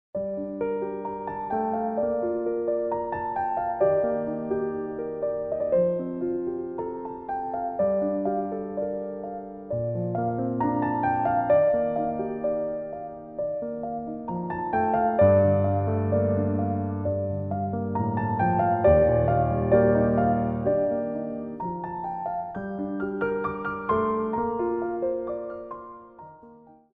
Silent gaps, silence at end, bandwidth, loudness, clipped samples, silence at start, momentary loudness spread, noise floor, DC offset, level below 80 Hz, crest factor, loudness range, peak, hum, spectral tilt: none; 0.2 s; 3.8 kHz; -26 LUFS; under 0.1%; 0.15 s; 12 LU; -51 dBFS; under 0.1%; -48 dBFS; 18 dB; 6 LU; -8 dBFS; none; -12.5 dB/octave